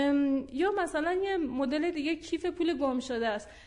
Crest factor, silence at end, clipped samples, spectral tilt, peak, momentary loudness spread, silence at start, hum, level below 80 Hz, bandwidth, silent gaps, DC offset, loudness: 12 dB; 0 s; under 0.1%; -4.5 dB/octave; -18 dBFS; 4 LU; 0 s; none; -58 dBFS; 11 kHz; none; under 0.1%; -30 LUFS